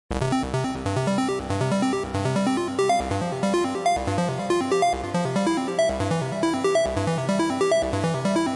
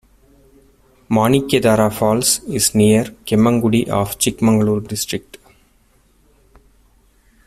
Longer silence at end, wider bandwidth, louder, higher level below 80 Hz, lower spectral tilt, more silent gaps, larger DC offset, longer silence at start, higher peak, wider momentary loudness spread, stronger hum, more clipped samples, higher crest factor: second, 0 s vs 2.1 s; second, 11.5 kHz vs 15.5 kHz; second, -24 LUFS vs -16 LUFS; about the same, -44 dBFS vs -46 dBFS; about the same, -5.5 dB/octave vs -4.5 dB/octave; neither; neither; second, 0.1 s vs 1.1 s; second, -10 dBFS vs -2 dBFS; second, 4 LU vs 7 LU; neither; neither; about the same, 14 dB vs 16 dB